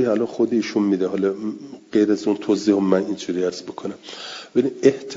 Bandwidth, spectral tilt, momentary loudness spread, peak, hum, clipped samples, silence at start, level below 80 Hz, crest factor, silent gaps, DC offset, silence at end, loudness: 7.8 kHz; -6 dB/octave; 14 LU; -2 dBFS; none; under 0.1%; 0 s; -66 dBFS; 20 dB; none; under 0.1%; 0 s; -21 LUFS